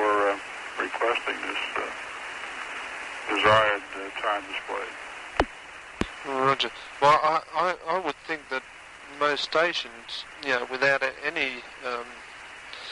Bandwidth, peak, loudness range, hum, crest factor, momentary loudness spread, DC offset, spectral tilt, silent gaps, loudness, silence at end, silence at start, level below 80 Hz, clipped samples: 11.5 kHz; -6 dBFS; 3 LU; none; 22 dB; 15 LU; under 0.1%; -3.5 dB/octave; none; -27 LUFS; 0 s; 0 s; -52 dBFS; under 0.1%